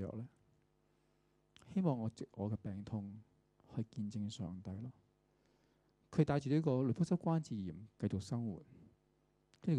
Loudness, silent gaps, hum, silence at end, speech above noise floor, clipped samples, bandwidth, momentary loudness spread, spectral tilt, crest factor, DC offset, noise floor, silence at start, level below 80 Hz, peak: -40 LUFS; none; 50 Hz at -65 dBFS; 0 s; 38 dB; under 0.1%; 10.5 kHz; 14 LU; -8 dB/octave; 22 dB; under 0.1%; -76 dBFS; 0 s; -70 dBFS; -18 dBFS